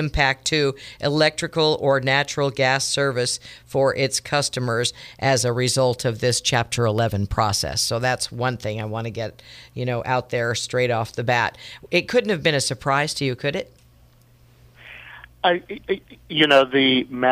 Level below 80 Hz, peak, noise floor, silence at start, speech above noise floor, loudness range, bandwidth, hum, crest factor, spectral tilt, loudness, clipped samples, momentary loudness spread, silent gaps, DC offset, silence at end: -46 dBFS; -2 dBFS; -53 dBFS; 0 s; 32 dB; 5 LU; 15.5 kHz; none; 20 dB; -4 dB/octave; -21 LUFS; under 0.1%; 10 LU; none; under 0.1%; 0 s